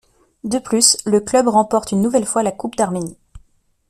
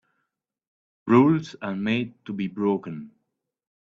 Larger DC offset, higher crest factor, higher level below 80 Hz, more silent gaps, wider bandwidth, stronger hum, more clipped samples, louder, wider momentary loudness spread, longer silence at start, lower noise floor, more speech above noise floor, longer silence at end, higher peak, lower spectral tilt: neither; about the same, 18 dB vs 22 dB; first, -50 dBFS vs -66 dBFS; neither; first, 15.5 kHz vs 7.4 kHz; neither; neither; first, -17 LUFS vs -24 LUFS; second, 11 LU vs 19 LU; second, 0.45 s vs 1.05 s; second, -56 dBFS vs -79 dBFS; second, 39 dB vs 56 dB; second, 0.5 s vs 0.8 s; first, 0 dBFS vs -4 dBFS; second, -3.5 dB/octave vs -8 dB/octave